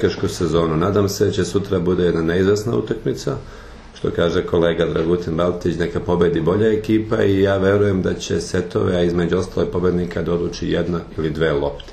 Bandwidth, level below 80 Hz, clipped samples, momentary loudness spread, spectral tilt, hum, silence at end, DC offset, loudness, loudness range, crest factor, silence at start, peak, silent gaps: 13 kHz; -38 dBFS; under 0.1%; 6 LU; -6.5 dB/octave; none; 0 s; under 0.1%; -19 LUFS; 3 LU; 16 dB; 0 s; -2 dBFS; none